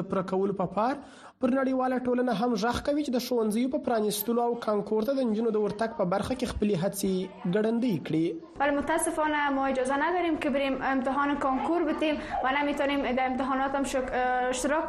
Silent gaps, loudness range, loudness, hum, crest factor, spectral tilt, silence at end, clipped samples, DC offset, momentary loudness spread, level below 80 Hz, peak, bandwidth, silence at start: none; 1 LU; -28 LUFS; none; 14 dB; -5 dB/octave; 0 s; under 0.1%; under 0.1%; 3 LU; -52 dBFS; -14 dBFS; 13 kHz; 0 s